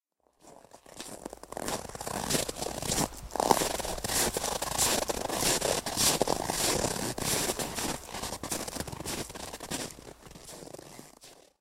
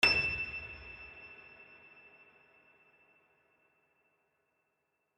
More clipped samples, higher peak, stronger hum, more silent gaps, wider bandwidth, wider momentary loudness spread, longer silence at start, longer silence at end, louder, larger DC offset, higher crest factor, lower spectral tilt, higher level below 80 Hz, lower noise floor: neither; first, -4 dBFS vs -12 dBFS; neither; neither; first, 16 kHz vs 11.5 kHz; second, 19 LU vs 26 LU; first, 0.45 s vs 0 s; second, 0.25 s vs 3.55 s; first, -30 LUFS vs -34 LUFS; neither; about the same, 28 dB vs 28 dB; about the same, -2 dB/octave vs -2.5 dB/octave; first, -50 dBFS vs -60 dBFS; second, -60 dBFS vs -82 dBFS